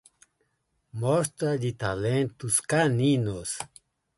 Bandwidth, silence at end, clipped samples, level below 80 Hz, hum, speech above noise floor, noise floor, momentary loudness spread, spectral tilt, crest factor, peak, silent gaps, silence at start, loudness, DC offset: 12 kHz; 0.5 s; under 0.1%; -56 dBFS; none; 49 dB; -75 dBFS; 11 LU; -5 dB/octave; 18 dB; -10 dBFS; none; 0.95 s; -26 LUFS; under 0.1%